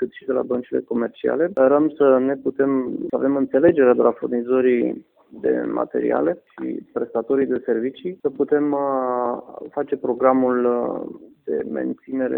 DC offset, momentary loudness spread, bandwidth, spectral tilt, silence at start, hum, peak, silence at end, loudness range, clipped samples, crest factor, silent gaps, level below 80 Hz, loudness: under 0.1%; 11 LU; 3.8 kHz; -10.5 dB/octave; 0 s; none; -2 dBFS; 0 s; 5 LU; under 0.1%; 18 dB; none; -64 dBFS; -21 LUFS